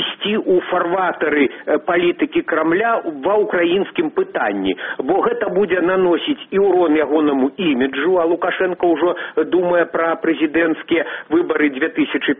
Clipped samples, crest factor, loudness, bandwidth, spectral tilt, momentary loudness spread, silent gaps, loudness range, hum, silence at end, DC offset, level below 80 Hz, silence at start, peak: under 0.1%; 14 dB; -17 LUFS; 3.8 kHz; -3 dB/octave; 4 LU; none; 2 LU; none; 0.05 s; under 0.1%; -56 dBFS; 0 s; -2 dBFS